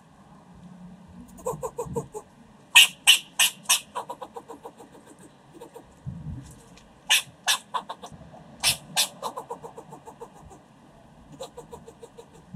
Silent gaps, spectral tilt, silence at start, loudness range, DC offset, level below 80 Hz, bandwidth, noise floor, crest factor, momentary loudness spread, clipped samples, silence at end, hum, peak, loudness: none; 0 dB/octave; 0.65 s; 13 LU; under 0.1%; -58 dBFS; 16 kHz; -53 dBFS; 28 dB; 28 LU; under 0.1%; 0.35 s; none; 0 dBFS; -21 LUFS